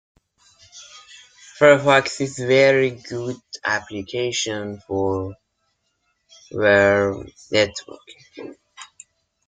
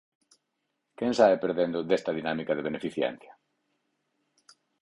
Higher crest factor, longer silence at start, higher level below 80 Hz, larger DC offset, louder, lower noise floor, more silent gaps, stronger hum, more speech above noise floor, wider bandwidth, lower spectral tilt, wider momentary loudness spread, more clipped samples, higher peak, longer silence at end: about the same, 20 dB vs 22 dB; second, 0.75 s vs 1 s; first, -60 dBFS vs -70 dBFS; neither; first, -19 LUFS vs -28 LUFS; second, -71 dBFS vs -80 dBFS; neither; neither; about the same, 51 dB vs 53 dB; second, 9.4 kHz vs 11.5 kHz; second, -4 dB/octave vs -5.5 dB/octave; first, 25 LU vs 10 LU; neither; first, -2 dBFS vs -8 dBFS; second, 0.65 s vs 1.5 s